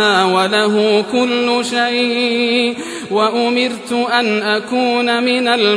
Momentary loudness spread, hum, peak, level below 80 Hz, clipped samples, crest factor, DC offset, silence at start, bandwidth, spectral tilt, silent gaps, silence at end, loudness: 4 LU; none; -2 dBFS; -64 dBFS; under 0.1%; 14 dB; under 0.1%; 0 s; 11 kHz; -3.5 dB/octave; none; 0 s; -15 LUFS